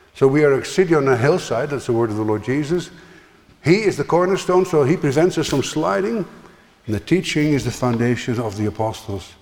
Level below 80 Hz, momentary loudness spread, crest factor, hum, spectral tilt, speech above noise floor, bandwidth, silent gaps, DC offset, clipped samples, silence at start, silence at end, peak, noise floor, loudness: -48 dBFS; 9 LU; 16 dB; none; -6 dB/octave; 30 dB; 17 kHz; none; under 0.1%; under 0.1%; 0.15 s; 0.1 s; -2 dBFS; -48 dBFS; -19 LUFS